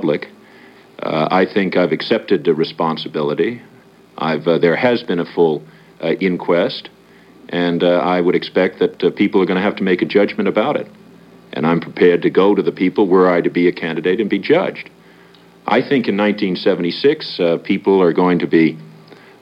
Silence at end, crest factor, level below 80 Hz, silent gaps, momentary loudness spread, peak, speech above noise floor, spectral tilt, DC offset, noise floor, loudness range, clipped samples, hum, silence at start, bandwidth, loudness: 0.3 s; 16 dB; -66 dBFS; none; 9 LU; 0 dBFS; 30 dB; -8 dB/octave; under 0.1%; -45 dBFS; 3 LU; under 0.1%; none; 0 s; 6.2 kHz; -16 LUFS